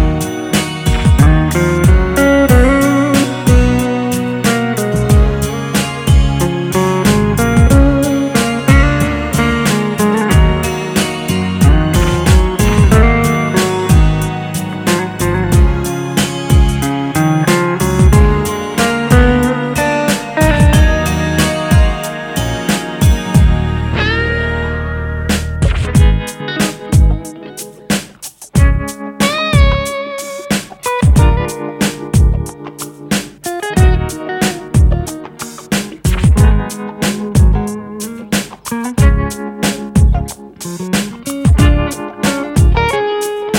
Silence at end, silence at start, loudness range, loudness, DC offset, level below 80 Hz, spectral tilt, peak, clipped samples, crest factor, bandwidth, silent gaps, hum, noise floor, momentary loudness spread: 0 s; 0 s; 4 LU; -13 LUFS; under 0.1%; -16 dBFS; -5.5 dB/octave; 0 dBFS; under 0.1%; 12 dB; 17.5 kHz; none; none; -32 dBFS; 10 LU